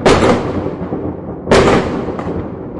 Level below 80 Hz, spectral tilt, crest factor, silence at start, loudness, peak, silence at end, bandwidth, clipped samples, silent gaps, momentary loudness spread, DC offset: -32 dBFS; -5.5 dB/octave; 14 dB; 0 s; -15 LUFS; 0 dBFS; 0 s; 11.5 kHz; under 0.1%; none; 13 LU; under 0.1%